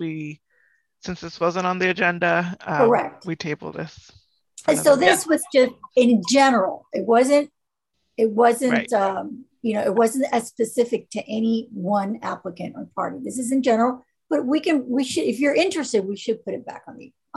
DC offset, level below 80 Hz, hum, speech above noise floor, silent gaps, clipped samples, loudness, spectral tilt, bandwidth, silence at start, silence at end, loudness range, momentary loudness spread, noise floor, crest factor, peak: under 0.1%; -64 dBFS; none; 57 dB; none; under 0.1%; -21 LUFS; -4.5 dB/octave; 13 kHz; 0 s; 0.3 s; 6 LU; 16 LU; -78 dBFS; 18 dB; -2 dBFS